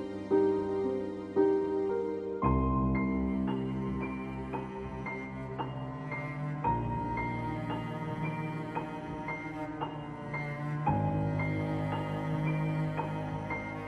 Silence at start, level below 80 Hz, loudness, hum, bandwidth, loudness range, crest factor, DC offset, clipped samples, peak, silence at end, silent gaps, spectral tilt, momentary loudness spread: 0 s; -48 dBFS; -33 LUFS; none; 9.8 kHz; 6 LU; 18 dB; under 0.1%; under 0.1%; -14 dBFS; 0 s; none; -9 dB/octave; 9 LU